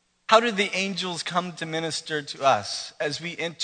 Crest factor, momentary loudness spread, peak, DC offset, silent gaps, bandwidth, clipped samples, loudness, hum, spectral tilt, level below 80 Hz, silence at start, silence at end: 24 dB; 10 LU; -2 dBFS; under 0.1%; none; 9.4 kHz; under 0.1%; -25 LUFS; none; -3 dB/octave; -74 dBFS; 0.3 s; 0 s